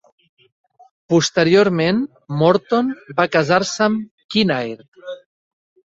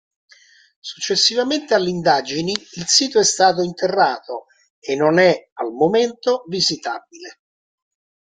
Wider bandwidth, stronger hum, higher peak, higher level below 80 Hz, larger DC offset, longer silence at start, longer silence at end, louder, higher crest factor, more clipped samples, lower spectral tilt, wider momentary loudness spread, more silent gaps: second, 8 kHz vs 9.6 kHz; neither; about the same, -2 dBFS vs 0 dBFS; first, -58 dBFS vs -64 dBFS; neither; first, 1.1 s vs 0.85 s; second, 0.75 s vs 1 s; about the same, -17 LUFS vs -18 LUFS; about the same, 18 dB vs 20 dB; neither; first, -5 dB/octave vs -2.5 dB/octave; about the same, 19 LU vs 17 LU; about the same, 4.11-4.18 s, 4.24-4.29 s, 4.88-4.92 s vs 4.70-4.82 s, 5.52-5.56 s